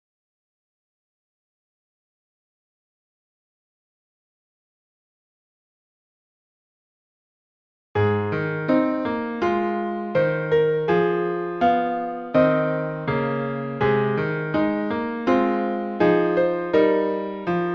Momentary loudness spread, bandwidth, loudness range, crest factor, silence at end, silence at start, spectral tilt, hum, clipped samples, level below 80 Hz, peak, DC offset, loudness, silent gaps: 7 LU; 6.6 kHz; 5 LU; 18 dB; 0 s; 7.95 s; -9 dB/octave; none; under 0.1%; -58 dBFS; -6 dBFS; under 0.1%; -22 LUFS; none